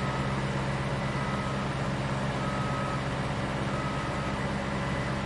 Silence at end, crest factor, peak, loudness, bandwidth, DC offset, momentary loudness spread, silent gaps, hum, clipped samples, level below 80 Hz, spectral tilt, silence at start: 0 s; 12 dB; -18 dBFS; -31 LUFS; 11.5 kHz; under 0.1%; 1 LU; none; none; under 0.1%; -44 dBFS; -6 dB/octave; 0 s